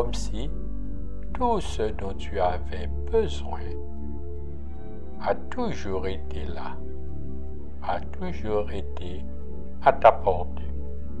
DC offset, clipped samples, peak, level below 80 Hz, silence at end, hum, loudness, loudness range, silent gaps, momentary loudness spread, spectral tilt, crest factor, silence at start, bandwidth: 5%; under 0.1%; -2 dBFS; -36 dBFS; 0 s; none; -29 LUFS; 8 LU; none; 14 LU; -6.5 dB/octave; 26 dB; 0 s; 11 kHz